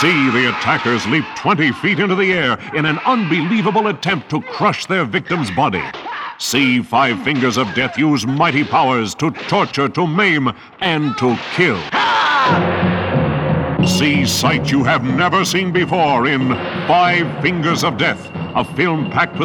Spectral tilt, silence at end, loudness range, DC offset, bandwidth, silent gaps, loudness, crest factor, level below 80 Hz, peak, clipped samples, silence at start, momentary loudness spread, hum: -5 dB/octave; 0 s; 2 LU; under 0.1%; 18 kHz; none; -16 LUFS; 14 dB; -46 dBFS; -2 dBFS; under 0.1%; 0 s; 5 LU; none